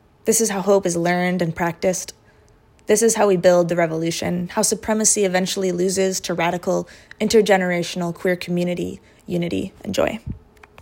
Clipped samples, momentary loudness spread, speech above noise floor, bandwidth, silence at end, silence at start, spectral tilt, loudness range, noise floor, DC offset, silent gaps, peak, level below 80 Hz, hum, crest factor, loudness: under 0.1%; 11 LU; 33 dB; 16.5 kHz; 0 s; 0.25 s; -4 dB/octave; 3 LU; -53 dBFS; under 0.1%; none; -2 dBFS; -52 dBFS; none; 18 dB; -20 LUFS